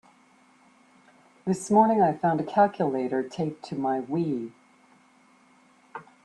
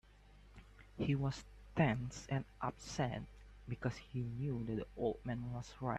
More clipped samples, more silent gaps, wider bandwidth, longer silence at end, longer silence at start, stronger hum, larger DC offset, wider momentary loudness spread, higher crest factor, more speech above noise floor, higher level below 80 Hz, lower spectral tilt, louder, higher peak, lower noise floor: neither; neither; first, 12 kHz vs 9.4 kHz; first, 0.2 s vs 0 s; first, 1.45 s vs 0.05 s; neither; neither; about the same, 17 LU vs 19 LU; about the same, 20 dB vs 20 dB; first, 35 dB vs 22 dB; second, -68 dBFS vs -58 dBFS; about the same, -7 dB/octave vs -6.5 dB/octave; first, -25 LUFS vs -41 LUFS; first, -8 dBFS vs -20 dBFS; about the same, -59 dBFS vs -62 dBFS